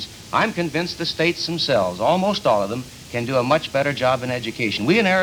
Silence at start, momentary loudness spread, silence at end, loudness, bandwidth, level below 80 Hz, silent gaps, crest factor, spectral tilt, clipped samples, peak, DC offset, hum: 0 s; 6 LU; 0 s; -21 LUFS; over 20 kHz; -52 dBFS; none; 18 dB; -5 dB/octave; under 0.1%; -4 dBFS; under 0.1%; none